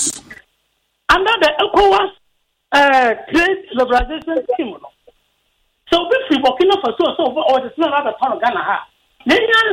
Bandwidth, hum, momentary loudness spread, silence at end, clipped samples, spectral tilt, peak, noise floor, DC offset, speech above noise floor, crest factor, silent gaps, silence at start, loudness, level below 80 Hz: 16.5 kHz; none; 10 LU; 0 s; under 0.1%; -2.5 dB/octave; 0 dBFS; -66 dBFS; under 0.1%; 51 dB; 16 dB; none; 0 s; -15 LUFS; -40 dBFS